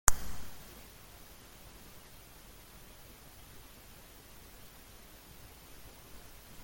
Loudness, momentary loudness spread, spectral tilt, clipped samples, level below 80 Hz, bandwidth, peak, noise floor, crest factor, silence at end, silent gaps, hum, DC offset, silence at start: -47 LUFS; 5 LU; -1.5 dB/octave; under 0.1%; -48 dBFS; 17 kHz; 0 dBFS; -54 dBFS; 38 dB; 0 s; none; none; under 0.1%; 0.05 s